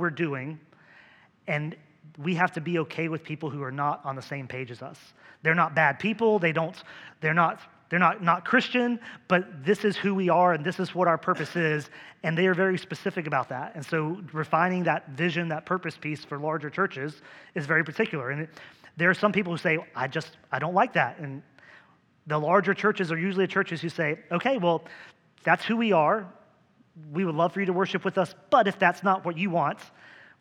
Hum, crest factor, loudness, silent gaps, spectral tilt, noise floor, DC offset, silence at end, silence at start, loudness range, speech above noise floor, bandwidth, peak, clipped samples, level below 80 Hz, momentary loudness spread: none; 22 dB; -26 LUFS; none; -6.5 dB/octave; -62 dBFS; under 0.1%; 0.3 s; 0 s; 5 LU; 35 dB; 12 kHz; -6 dBFS; under 0.1%; -78 dBFS; 13 LU